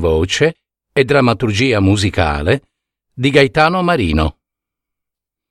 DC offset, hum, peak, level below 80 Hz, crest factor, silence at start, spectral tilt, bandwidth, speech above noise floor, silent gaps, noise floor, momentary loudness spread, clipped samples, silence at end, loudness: under 0.1%; none; 0 dBFS; -30 dBFS; 16 dB; 0 s; -5.5 dB/octave; 13 kHz; 69 dB; none; -83 dBFS; 6 LU; under 0.1%; 1.2 s; -14 LUFS